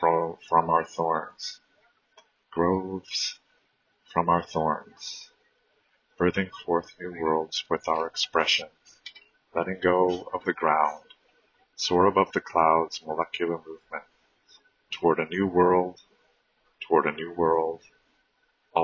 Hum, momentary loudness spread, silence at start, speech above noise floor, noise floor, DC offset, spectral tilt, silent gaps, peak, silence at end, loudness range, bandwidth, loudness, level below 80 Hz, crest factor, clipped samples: none; 16 LU; 0 s; 45 dB; -71 dBFS; under 0.1%; -4.5 dB/octave; none; -6 dBFS; 0 s; 4 LU; 7.4 kHz; -26 LUFS; -58 dBFS; 22 dB; under 0.1%